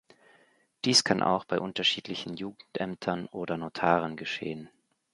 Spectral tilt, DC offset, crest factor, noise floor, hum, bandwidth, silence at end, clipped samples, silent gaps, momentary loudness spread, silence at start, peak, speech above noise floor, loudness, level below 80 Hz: -3.5 dB/octave; under 0.1%; 24 dB; -65 dBFS; none; 11.5 kHz; 0.45 s; under 0.1%; none; 15 LU; 0.85 s; -8 dBFS; 35 dB; -29 LUFS; -66 dBFS